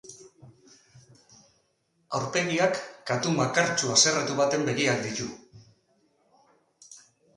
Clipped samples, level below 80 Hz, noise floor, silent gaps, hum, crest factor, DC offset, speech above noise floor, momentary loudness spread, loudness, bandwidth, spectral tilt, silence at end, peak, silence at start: under 0.1%; -68 dBFS; -71 dBFS; none; none; 22 dB; under 0.1%; 46 dB; 14 LU; -25 LUFS; 11.5 kHz; -3 dB/octave; 0.4 s; -8 dBFS; 0.05 s